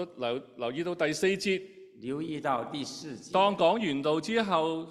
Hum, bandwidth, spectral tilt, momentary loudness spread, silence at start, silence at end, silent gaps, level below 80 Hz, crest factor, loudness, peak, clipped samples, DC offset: none; 13 kHz; -4.5 dB/octave; 11 LU; 0 s; 0 s; none; -70 dBFS; 20 dB; -30 LUFS; -10 dBFS; under 0.1%; under 0.1%